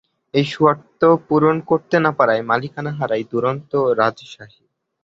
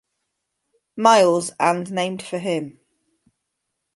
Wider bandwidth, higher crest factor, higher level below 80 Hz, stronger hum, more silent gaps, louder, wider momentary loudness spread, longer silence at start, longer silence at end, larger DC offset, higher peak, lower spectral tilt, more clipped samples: second, 7.6 kHz vs 11.5 kHz; about the same, 16 dB vs 20 dB; first, -60 dBFS vs -72 dBFS; neither; neither; about the same, -18 LUFS vs -19 LUFS; second, 7 LU vs 13 LU; second, 0.35 s vs 0.95 s; second, 0.6 s vs 1.25 s; neither; about the same, -2 dBFS vs -2 dBFS; first, -7.5 dB/octave vs -4 dB/octave; neither